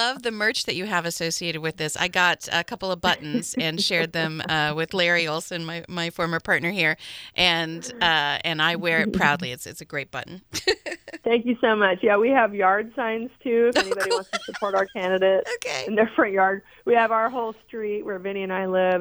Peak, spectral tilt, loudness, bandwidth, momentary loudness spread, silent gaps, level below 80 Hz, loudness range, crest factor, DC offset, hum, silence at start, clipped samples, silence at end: -4 dBFS; -3.5 dB/octave; -23 LUFS; over 20 kHz; 11 LU; none; -58 dBFS; 2 LU; 20 dB; under 0.1%; none; 0 s; under 0.1%; 0 s